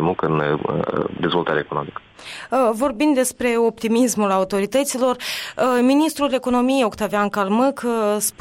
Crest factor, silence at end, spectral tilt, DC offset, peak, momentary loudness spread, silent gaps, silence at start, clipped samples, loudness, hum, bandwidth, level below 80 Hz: 12 dB; 0.1 s; -4.5 dB/octave; under 0.1%; -8 dBFS; 6 LU; none; 0 s; under 0.1%; -20 LUFS; none; 16.5 kHz; -54 dBFS